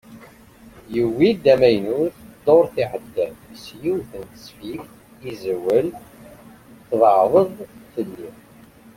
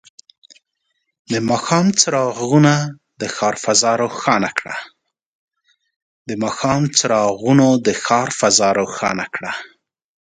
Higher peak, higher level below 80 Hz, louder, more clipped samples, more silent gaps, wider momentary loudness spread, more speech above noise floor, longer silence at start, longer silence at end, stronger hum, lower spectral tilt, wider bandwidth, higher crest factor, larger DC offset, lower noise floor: about the same, -2 dBFS vs 0 dBFS; about the same, -56 dBFS vs -56 dBFS; second, -19 LUFS vs -16 LUFS; neither; second, none vs 5.26-5.48 s, 5.96-6.25 s; first, 22 LU vs 14 LU; second, 28 dB vs 55 dB; second, 0.1 s vs 1.3 s; about the same, 0.65 s vs 0.7 s; neither; first, -7 dB/octave vs -4 dB/octave; first, 16.5 kHz vs 10 kHz; about the same, 18 dB vs 18 dB; neither; second, -47 dBFS vs -72 dBFS